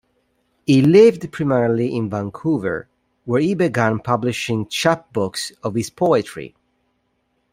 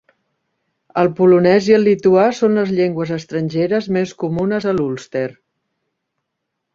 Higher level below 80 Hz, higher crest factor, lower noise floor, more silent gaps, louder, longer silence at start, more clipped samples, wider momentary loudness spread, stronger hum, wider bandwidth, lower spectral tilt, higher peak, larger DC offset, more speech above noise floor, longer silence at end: about the same, -56 dBFS vs -56 dBFS; about the same, 18 dB vs 16 dB; second, -68 dBFS vs -76 dBFS; neither; second, -19 LUFS vs -16 LUFS; second, 0.7 s vs 0.95 s; neither; about the same, 13 LU vs 11 LU; neither; first, 16 kHz vs 7.6 kHz; about the same, -6 dB/octave vs -7 dB/octave; about the same, -2 dBFS vs 0 dBFS; neither; second, 50 dB vs 61 dB; second, 1.05 s vs 1.4 s